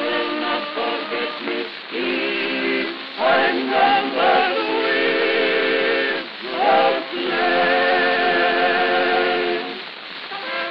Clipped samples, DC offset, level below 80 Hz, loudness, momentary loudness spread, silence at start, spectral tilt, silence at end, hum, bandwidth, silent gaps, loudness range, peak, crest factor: under 0.1%; 0.2%; -68 dBFS; -19 LUFS; 9 LU; 0 s; -5.5 dB/octave; 0 s; none; 6 kHz; none; 3 LU; -4 dBFS; 16 dB